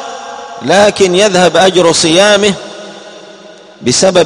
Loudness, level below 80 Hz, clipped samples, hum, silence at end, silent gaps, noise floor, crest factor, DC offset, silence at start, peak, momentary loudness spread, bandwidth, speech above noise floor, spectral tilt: -8 LUFS; -46 dBFS; 0.5%; none; 0 s; none; -34 dBFS; 10 dB; under 0.1%; 0 s; 0 dBFS; 18 LU; 12.5 kHz; 27 dB; -3 dB/octave